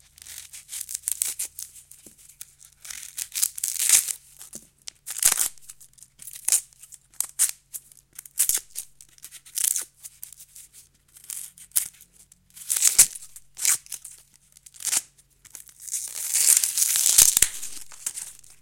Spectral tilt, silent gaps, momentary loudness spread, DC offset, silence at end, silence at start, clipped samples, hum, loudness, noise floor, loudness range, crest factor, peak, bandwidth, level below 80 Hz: 2.5 dB/octave; none; 26 LU; under 0.1%; 0.3 s; 0.25 s; under 0.1%; none; -21 LUFS; -56 dBFS; 10 LU; 28 dB; 0 dBFS; 17 kHz; -60 dBFS